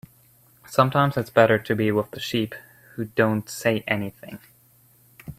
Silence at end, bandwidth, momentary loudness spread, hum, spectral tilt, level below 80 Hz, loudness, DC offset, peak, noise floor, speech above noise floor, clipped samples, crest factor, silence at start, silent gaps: 0.05 s; 16 kHz; 22 LU; none; -6 dB/octave; -60 dBFS; -23 LUFS; under 0.1%; -2 dBFS; -57 dBFS; 35 dB; under 0.1%; 22 dB; 0.7 s; none